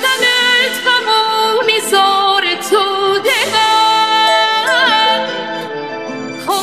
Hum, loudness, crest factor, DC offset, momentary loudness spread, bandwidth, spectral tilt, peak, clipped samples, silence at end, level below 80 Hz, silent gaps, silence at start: none; -12 LUFS; 12 dB; 0.3%; 12 LU; 16 kHz; -1 dB/octave; 0 dBFS; under 0.1%; 0 s; -66 dBFS; none; 0 s